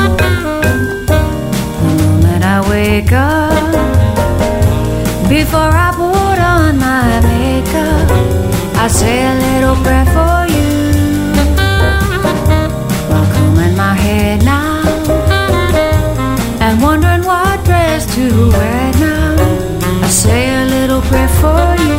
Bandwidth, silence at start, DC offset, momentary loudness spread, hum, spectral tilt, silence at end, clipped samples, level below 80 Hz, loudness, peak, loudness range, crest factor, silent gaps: 16.5 kHz; 0 s; under 0.1%; 4 LU; none; -5.5 dB/octave; 0 s; under 0.1%; -18 dBFS; -11 LUFS; 0 dBFS; 1 LU; 10 dB; none